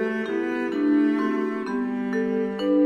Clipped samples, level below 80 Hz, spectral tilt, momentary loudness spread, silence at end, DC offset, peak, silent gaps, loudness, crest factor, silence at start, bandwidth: under 0.1%; -64 dBFS; -7 dB/octave; 6 LU; 0 s; under 0.1%; -12 dBFS; none; -24 LUFS; 12 dB; 0 s; 7.2 kHz